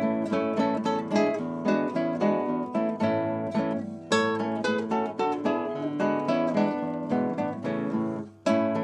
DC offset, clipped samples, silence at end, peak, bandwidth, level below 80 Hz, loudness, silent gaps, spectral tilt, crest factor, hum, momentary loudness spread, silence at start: under 0.1%; under 0.1%; 0 s; -10 dBFS; 10.5 kHz; -72 dBFS; -27 LUFS; none; -6.5 dB/octave; 16 dB; none; 5 LU; 0 s